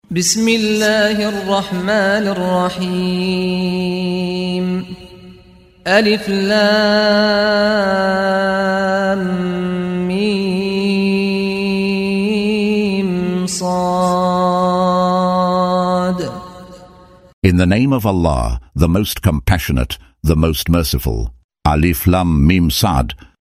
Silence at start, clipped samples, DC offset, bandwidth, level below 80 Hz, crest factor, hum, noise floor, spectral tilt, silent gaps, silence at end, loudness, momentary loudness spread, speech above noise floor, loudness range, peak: 0.1 s; under 0.1%; under 0.1%; 16 kHz; -30 dBFS; 16 dB; none; -44 dBFS; -5.5 dB/octave; 17.33-17.42 s, 21.44-21.49 s; 0.25 s; -16 LUFS; 7 LU; 29 dB; 3 LU; 0 dBFS